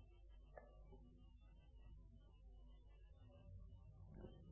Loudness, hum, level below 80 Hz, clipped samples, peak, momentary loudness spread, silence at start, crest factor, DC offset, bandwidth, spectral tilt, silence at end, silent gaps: -65 LUFS; none; -64 dBFS; under 0.1%; -42 dBFS; 7 LU; 0 s; 20 dB; under 0.1%; 3.6 kHz; -7.5 dB/octave; 0 s; none